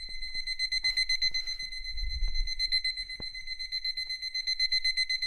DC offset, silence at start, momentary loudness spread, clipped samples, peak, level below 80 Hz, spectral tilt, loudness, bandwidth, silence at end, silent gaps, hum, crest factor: under 0.1%; 0 s; 10 LU; under 0.1%; -18 dBFS; -40 dBFS; 1 dB/octave; -30 LUFS; 14 kHz; 0 s; none; none; 14 dB